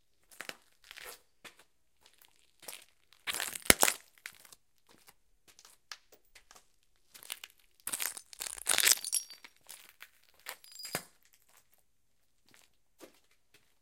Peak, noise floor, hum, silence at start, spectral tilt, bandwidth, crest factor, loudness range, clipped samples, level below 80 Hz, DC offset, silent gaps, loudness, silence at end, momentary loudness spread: 0 dBFS; -80 dBFS; none; 0.4 s; 0 dB/octave; 17 kHz; 38 dB; 18 LU; under 0.1%; -64 dBFS; under 0.1%; none; -31 LUFS; 0.75 s; 28 LU